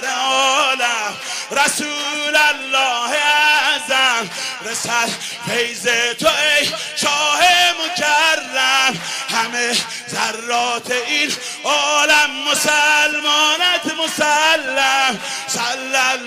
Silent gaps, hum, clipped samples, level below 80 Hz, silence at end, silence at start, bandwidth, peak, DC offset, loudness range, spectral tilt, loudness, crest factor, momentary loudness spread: none; none; under 0.1%; -60 dBFS; 0 s; 0 s; 15.5 kHz; -4 dBFS; under 0.1%; 3 LU; 0 dB/octave; -15 LUFS; 12 dB; 8 LU